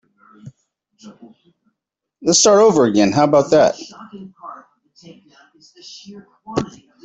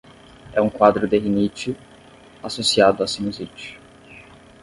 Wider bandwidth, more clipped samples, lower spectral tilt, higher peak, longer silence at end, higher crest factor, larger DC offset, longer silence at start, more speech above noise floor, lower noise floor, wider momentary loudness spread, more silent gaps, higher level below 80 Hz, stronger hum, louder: second, 8.2 kHz vs 11.5 kHz; neither; about the same, -4 dB/octave vs -4.5 dB/octave; about the same, -2 dBFS vs 0 dBFS; about the same, 0.35 s vs 0.4 s; second, 16 dB vs 22 dB; neither; about the same, 0.45 s vs 0.45 s; first, 67 dB vs 27 dB; first, -80 dBFS vs -47 dBFS; first, 26 LU vs 19 LU; neither; second, -58 dBFS vs -52 dBFS; neither; first, -14 LUFS vs -20 LUFS